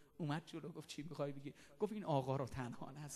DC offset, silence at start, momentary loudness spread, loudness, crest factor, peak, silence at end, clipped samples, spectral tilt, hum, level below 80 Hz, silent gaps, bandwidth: under 0.1%; 0 s; 12 LU; -45 LUFS; 20 dB; -24 dBFS; 0 s; under 0.1%; -6.5 dB/octave; none; -70 dBFS; none; 13 kHz